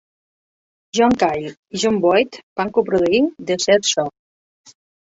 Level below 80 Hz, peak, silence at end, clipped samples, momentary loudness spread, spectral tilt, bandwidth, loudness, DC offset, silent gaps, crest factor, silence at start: -54 dBFS; -2 dBFS; 0.95 s; under 0.1%; 10 LU; -3.5 dB/octave; 8.2 kHz; -18 LUFS; under 0.1%; 1.57-1.63 s, 2.43-2.56 s; 18 dB; 0.95 s